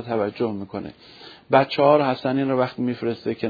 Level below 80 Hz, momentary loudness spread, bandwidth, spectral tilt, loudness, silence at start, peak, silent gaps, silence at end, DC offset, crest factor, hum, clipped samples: -64 dBFS; 16 LU; 5 kHz; -8.5 dB/octave; -21 LUFS; 0 s; 0 dBFS; none; 0 s; under 0.1%; 22 dB; none; under 0.1%